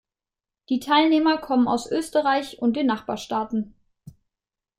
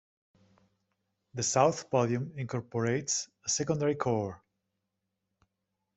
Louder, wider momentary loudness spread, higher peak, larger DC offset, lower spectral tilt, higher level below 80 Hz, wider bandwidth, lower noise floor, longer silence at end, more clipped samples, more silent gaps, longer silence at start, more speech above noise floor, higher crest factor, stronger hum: first, -23 LUFS vs -30 LUFS; about the same, 10 LU vs 9 LU; first, -6 dBFS vs -10 dBFS; neither; about the same, -4.5 dB/octave vs -4.5 dB/octave; first, -60 dBFS vs -68 dBFS; first, 15 kHz vs 8.2 kHz; first, -89 dBFS vs -84 dBFS; second, 0.7 s vs 1.6 s; neither; neither; second, 0.7 s vs 1.35 s; first, 67 dB vs 54 dB; about the same, 18 dB vs 22 dB; neither